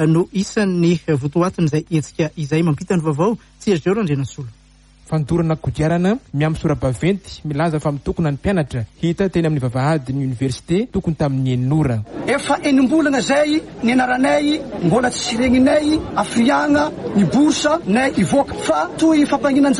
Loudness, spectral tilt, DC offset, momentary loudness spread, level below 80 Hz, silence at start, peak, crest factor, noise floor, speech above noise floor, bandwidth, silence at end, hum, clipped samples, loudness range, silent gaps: -18 LUFS; -6 dB/octave; under 0.1%; 7 LU; -42 dBFS; 0 s; -4 dBFS; 14 dB; -48 dBFS; 31 dB; 11.5 kHz; 0 s; none; under 0.1%; 4 LU; none